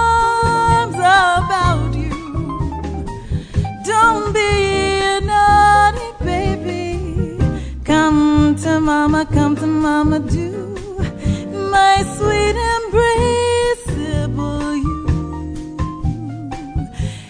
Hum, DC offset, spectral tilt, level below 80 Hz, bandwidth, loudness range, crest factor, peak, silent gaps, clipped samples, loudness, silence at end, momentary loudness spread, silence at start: none; under 0.1%; -5.5 dB/octave; -28 dBFS; 10 kHz; 4 LU; 16 dB; 0 dBFS; none; under 0.1%; -16 LUFS; 0 s; 13 LU; 0 s